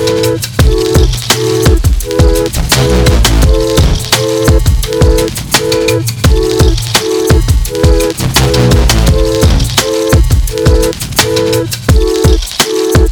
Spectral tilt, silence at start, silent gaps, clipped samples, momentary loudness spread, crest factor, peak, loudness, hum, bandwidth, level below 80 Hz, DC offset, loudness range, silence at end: -4.5 dB/octave; 0 s; none; 0.5%; 3 LU; 8 dB; 0 dBFS; -10 LUFS; none; over 20 kHz; -12 dBFS; under 0.1%; 1 LU; 0 s